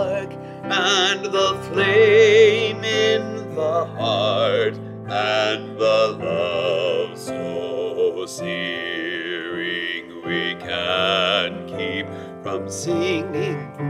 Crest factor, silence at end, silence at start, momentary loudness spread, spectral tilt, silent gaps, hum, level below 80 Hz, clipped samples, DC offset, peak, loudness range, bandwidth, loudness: 18 dB; 0 s; 0 s; 12 LU; -4 dB/octave; none; none; -60 dBFS; under 0.1%; under 0.1%; -4 dBFS; 8 LU; 12.5 kHz; -20 LUFS